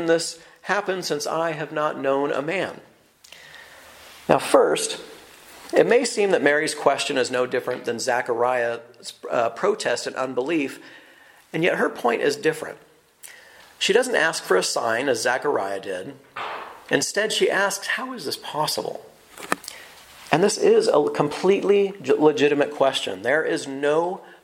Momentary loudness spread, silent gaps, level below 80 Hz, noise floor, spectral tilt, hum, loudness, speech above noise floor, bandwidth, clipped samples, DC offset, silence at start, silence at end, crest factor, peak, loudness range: 15 LU; none; -70 dBFS; -51 dBFS; -3.5 dB/octave; none; -22 LUFS; 29 dB; 16 kHz; under 0.1%; under 0.1%; 0 s; 0.1 s; 22 dB; 0 dBFS; 5 LU